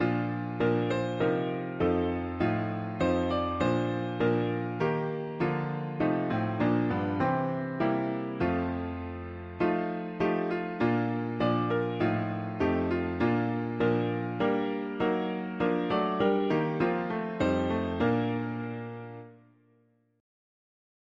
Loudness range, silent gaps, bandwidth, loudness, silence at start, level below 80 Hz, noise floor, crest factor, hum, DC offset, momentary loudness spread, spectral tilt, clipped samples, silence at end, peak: 2 LU; none; 7.4 kHz; -30 LUFS; 0 s; -54 dBFS; -67 dBFS; 16 dB; none; under 0.1%; 6 LU; -8.5 dB/octave; under 0.1%; 1.8 s; -14 dBFS